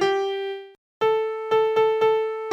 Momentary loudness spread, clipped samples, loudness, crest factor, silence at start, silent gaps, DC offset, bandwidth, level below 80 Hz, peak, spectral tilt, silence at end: 10 LU; under 0.1%; -23 LUFS; 12 dB; 0 s; 0.78-1.01 s; under 0.1%; 7.8 kHz; -68 dBFS; -10 dBFS; -4.5 dB/octave; 0 s